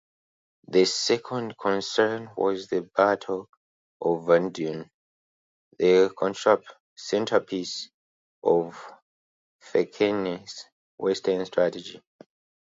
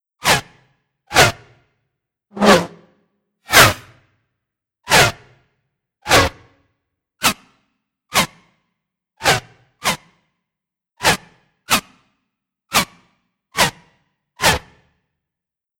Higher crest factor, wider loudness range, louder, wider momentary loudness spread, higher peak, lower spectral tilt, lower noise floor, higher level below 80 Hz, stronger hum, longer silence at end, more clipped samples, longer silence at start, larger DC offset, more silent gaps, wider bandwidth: about the same, 22 dB vs 20 dB; second, 4 LU vs 7 LU; second, -25 LUFS vs -16 LUFS; about the same, 14 LU vs 15 LU; second, -4 dBFS vs 0 dBFS; first, -4.5 dB/octave vs -2.5 dB/octave; first, under -90 dBFS vs -83 dBFS; second, -70 dBFS vs -42 dBFS; neither; second, 0.7 s vs 1.2 s; neither; first, 0.7 s vs 0.25 s; neither; first, 3.49-4.00 s, 4.94-5.71 s, 6.80-6.96 s, 7.94-8.42 s, 9.02-9.59 s, 10.72-10.98 s vs none; second, 8 kHz vs over 20 kHz